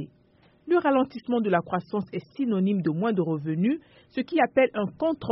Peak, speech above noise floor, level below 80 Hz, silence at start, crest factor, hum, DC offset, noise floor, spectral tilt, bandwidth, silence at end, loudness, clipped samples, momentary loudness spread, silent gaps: -8 dBFS; 35 dB; -66 dBFS; 0 s; 18 dB; none; under 0.1%; -60 dBFS; -6 dB/octave; 5.8 kHz; 0 s; -26 LUFS; under 0.1%; 10 LU; none